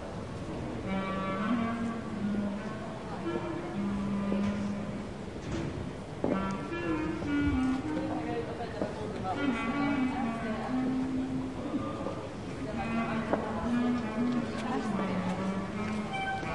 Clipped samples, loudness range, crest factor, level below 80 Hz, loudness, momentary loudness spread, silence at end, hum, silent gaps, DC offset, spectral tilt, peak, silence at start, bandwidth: under 0.1%; 2 LU; 20 dB; -50 dBFS; -33 LUFS; 7 LU; 0 s; none; none; 0.2%; -7 dB/octave; -14 dBFS; 0 s; 11.5 kHz